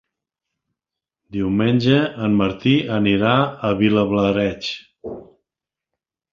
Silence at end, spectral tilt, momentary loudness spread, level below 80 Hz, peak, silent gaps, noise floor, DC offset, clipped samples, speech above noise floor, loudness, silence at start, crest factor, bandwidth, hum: 1.1 s; -7.5 dB/octave; 16 LU; -48 dBFS; -2 dBFS; none; -87 dBFS; under 0.1%; under 0.1%; 69 dB; -18 LUFS; 1.3 s; 18 dB; 7.2 kHz; none